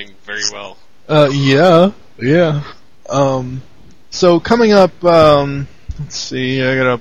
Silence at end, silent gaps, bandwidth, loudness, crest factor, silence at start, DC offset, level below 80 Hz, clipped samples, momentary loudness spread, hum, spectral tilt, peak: 0 s; none; 10.5 kHz; -13 LUFS; 14 dB; 0 s; 2%; -40 dBFS; under 0.1%; 18 LU; none; -5.5 dB/octave; 0 dBFS